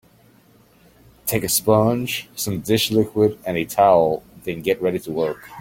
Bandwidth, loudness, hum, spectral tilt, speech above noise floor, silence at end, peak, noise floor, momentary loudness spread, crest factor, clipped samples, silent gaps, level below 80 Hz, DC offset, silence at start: 17 kHz; -20 LUFS; none; -4.5 dB/octave; 34 dB; 0 s; -2 dBFS; -53 dBFS; 10 LU; 18 dB; under 0.1%; none; -52 dBFS; under 0.1%; 1.25 s